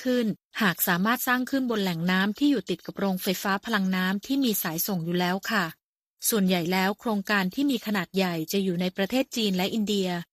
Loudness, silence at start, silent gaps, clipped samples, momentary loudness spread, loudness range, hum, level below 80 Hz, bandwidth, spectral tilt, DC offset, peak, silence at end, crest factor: -26 LUFS; 0 s; 0.45-0.51 s, 5.83-6.17 s; under 0.1%; 4 LU; 1 LU; none; -66 dBFS; 15.5 kHz; -4.5 dB/octave; under 0.1%; -8 dBFS; 0.1 s; 18 dB